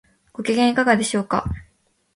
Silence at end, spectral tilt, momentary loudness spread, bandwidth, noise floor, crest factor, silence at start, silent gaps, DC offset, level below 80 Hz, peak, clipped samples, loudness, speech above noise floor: 0.55 s; -4.5 dB/octave; 16 LU; 11.5 kHz; -63 dBFS; 20 dB; 0.4 s; none; under 0.1%; -42 dBFS; -2 dBFS; under 0.1%; -20 LUFS; 44 dB